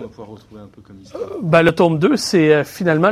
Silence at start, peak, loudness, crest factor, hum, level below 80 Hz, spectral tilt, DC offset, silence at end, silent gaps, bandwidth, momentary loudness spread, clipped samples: 0 s; 0 dBFS; -15 LUFS; 16 dB; none; -52 dBFS; -6 dB/octave; under 0.1%; 0 s; none; 15.5 kHz; 17 LU; under 0.1%